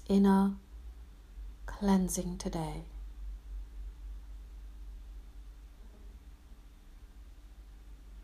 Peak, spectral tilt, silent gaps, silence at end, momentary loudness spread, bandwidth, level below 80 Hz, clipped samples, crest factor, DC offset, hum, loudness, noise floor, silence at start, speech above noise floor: -16 dBFS; -6.5 dB/octave; none; 0 s; 26 LU; 15.5 kHz; -46 dBFS; under 0.1%; 20 dB; under 0.1%; none; -32 LUFS; -53 dBFS; 0 s; 24 dB